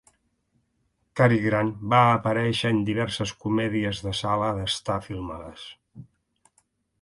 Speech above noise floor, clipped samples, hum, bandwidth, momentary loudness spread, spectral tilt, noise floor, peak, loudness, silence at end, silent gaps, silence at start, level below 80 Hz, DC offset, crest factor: 48 dB; under 0.1%; none; 11.5 kHz; 17 LU; -6 dB/octave; -72 dBFS; -4 dBFS; -24 LUFS; 1 s; none; 1.15 s; -52 dBFS; under 0.1%; 22 dB